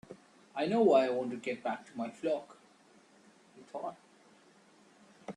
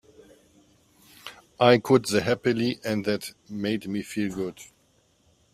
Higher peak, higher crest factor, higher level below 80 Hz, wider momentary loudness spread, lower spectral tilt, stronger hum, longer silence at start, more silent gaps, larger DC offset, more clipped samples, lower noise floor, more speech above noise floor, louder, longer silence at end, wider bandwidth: second, -14 dBFS vs -2 dBFS; about the same, 22 dB vs 24 dB; second, -82 dBFS vs -62 dBFS; about the same, 22 LU vs 23 LU; about the same, -6 dB/octave vs -5.5 dB/octave; neither; second, 0.1 s vs 1.25 s; neither; neither; neither; about the same, -63 dBFS vs -65 dBFS; second, 31 dB vs 40 dB; second, -33 LUFS vs -25 LUFS; second, 0.05 s vs 0.9 s; second, 11 kHz vs 15.5 kHz